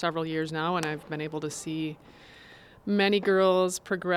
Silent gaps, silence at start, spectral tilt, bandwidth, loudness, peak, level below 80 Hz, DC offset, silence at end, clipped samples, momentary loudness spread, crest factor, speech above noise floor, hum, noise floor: none; 0 s; -4.5 dB/octave; 14.5 kHz; -28 LUFS; -12 dBFS; -64 dBFS; under 0.1%; 0 s; under 0.1%; 12 LU; 16 dB; 24 dB; none; -52 dBFS